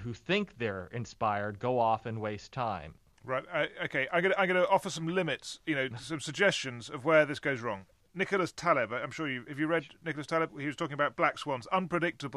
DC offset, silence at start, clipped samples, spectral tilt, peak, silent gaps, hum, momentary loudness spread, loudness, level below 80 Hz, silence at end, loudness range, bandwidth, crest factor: under 0.1%; 0 s; under 0.1%; -5 dB/octave; -12 dBFS; none; none; 11 LU; -32 LUFS; -66 dBFS; 0 s; 3 LU; 13 kHz; 20 dB